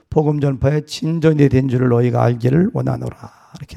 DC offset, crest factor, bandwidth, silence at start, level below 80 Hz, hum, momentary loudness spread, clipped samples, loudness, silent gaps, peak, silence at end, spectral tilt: under 0.1%; 16 dB; 11.5 kHz; 0.1 s; -42 dBFS; none; 8 LU; under 0.1%; -16 LUFS; none; 0 dBFS; 0 s; -8 dB/octave